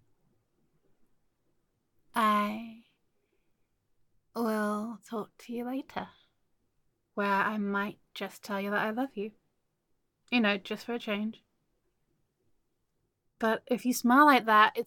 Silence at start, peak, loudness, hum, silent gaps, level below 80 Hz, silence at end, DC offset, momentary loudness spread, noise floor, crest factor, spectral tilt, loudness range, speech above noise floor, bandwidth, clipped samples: 2.15 s; -8 dBFS; -29 LUFS; none; none; -76 dBFS; 0 s; under 0.1%; 19 LU; -78 dBFS; 24 dB; -4.5 dB/octave; 5 LU; 49 dB; 17.5 kHz; under 0.1%